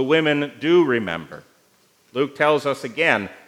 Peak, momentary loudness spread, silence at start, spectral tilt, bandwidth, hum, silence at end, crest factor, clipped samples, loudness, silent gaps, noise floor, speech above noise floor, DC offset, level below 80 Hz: -2 dBFS; 12 LU; 0 s; -5.5 dB/octave; 12.5 kHz; none; 0.15 s; 20 dB; under 0.1%; -20 LUFS; none; -59 dBFS; 39 dB; under 0.1%; -70 dBFS